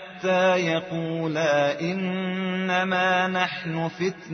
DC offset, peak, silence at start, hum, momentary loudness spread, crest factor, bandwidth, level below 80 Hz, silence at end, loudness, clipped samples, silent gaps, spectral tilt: under 0.1%; -8 dBFS; 0 s; none; 7 LU; 16 dB; 6.4 kHz; -68 dBFS; 0 s; -24 LUFS; under 0.1%; none; -3.5 dB/octave